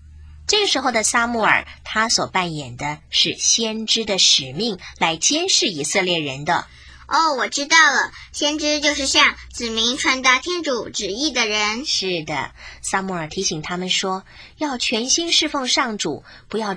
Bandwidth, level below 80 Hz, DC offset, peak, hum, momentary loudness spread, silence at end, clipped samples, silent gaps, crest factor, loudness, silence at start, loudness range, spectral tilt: 10.5 kHz; -48 dBFS; under 0.1%; 0 dBFS; none; 12 LU; 0 s; under 0.1%; none; 20 dB; -18 LUFS; 0.05 s; 5 LU; -1.5 dB/octave